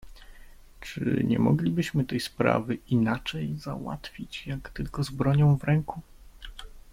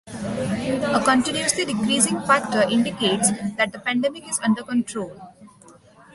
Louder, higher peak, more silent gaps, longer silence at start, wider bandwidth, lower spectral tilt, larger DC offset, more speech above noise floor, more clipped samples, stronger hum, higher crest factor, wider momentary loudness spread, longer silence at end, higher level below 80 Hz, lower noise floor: second, -27 LUFS vs -21 LUFS; second, -8 dBFS vs -4 dBFS; neither; about the same, 0.05 s vs 0.05 s; first, 15.5 kHz vs 12 kHz; first, -7 dB/octave vs -3 dB/octave; neither; second, 22 dB vs 28 dB; neither; neither; about the same, 20 dB vs 20 dB; first, 21 LU vs 7 LU; second, 0.1 s vs 0.45 s; first, -48 dBFS vs -56 dBFS; about the same, -48 dBFS vs -50 dBFS